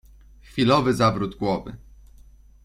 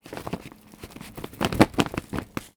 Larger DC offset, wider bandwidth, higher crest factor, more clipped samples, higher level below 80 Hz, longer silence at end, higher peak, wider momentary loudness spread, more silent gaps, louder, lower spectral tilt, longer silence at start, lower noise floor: neither; second, 13.5 kHz vs over 20 kHz; second, 20 dB vs 28 dB; neither; about the same, -48 dBFS vs -46 dBFS; first, 0.9 s vs 0.1 s; second, -4 dBFS vs 0 dBFS; second, 13 LU vs 23 LU; neither; first, -22 LUFS vs -26 LUFS; about the same, -6.5 dB/octave vs -5.5 dB/octave; first, 0.55 s vs 0.05 s; first, -49 dBFS vs -45 dBFS